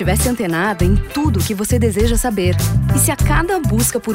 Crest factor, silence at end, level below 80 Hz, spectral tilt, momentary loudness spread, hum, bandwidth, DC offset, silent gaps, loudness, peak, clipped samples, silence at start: 12 dB; 0 s; -24 dBFS; -5 dB/octave; 3 LU; none; 16.5 kHz; under 0.1%; none; -16 LUFS; -2 dBFS; under 0.1%; 0 s